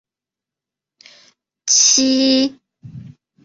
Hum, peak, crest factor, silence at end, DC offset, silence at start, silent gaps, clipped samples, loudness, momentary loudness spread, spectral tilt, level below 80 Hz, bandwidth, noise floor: none; -2 dBFS; 18 dB; 0.35 s; under 0.1%; 1.65 s; none; under 0.1%; -13 LUFS; 12 LU; -1 dB/octave; -62 dBFS; 7.8 kHz; -88 dBFS